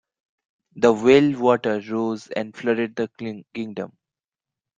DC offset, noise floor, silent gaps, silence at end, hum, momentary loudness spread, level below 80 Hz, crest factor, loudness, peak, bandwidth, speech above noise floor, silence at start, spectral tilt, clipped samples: under 0.1%; -89 dBFS; none; 0.9 s; none; 16 LU; -62 dBFS; 20 dB; -21 LUFS; -2 dBFS; 7.8 kHz; 68 dB; 0.75 s; -6 dB/octave; under 0.1%